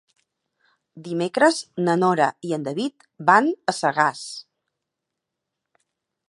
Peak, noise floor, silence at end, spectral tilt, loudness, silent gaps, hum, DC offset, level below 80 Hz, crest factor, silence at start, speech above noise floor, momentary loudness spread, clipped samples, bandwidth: -2 dBFS; -83 dBFS; 1.9 s; -5 dB/octave; -21 LUFS; none; none; under 0.1%; -76 dBFS; 22 dB; 0.95 s; 62 dB; 15 LU; under 0.1%; 11.5 kHz